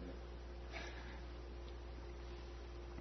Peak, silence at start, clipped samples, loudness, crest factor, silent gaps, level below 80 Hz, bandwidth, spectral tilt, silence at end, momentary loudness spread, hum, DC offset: -34 dBFS; 0 s; under 0.1%; -52 LUFS; 16 dB; none; -52 dBFS; 6.2 kHz; -5 dB/octave; 0 s; 3 LU; 60 Hz at -50 dBFS; under 0.1%